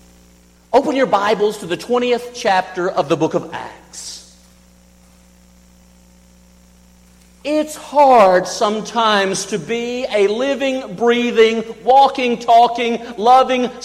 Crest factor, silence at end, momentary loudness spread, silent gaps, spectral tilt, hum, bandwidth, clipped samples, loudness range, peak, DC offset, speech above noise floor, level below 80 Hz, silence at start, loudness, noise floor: 14 dB; 0 s; 11 LU; none; -4 dB/octave; 60 Hz at -50 dBFS; 15 kHz; under 0.1%; 11 LU; -2 dBFS; under 0.1%; 33 dB; -54 dBFS; 0.7 s; -15 LUFS; -49 dBFS